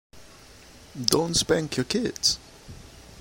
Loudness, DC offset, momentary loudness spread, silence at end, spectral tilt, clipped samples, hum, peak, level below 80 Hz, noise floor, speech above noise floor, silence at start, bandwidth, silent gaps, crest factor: -24 LUFS; under 0.1%; 23 LU; 0 s; -3 dB/octave; under 0.1%; none; 0 dBFS; -50 dBFS; -49 dBFS; 24 dB; 0.15 s; 16.5 kHz; none; 28 dB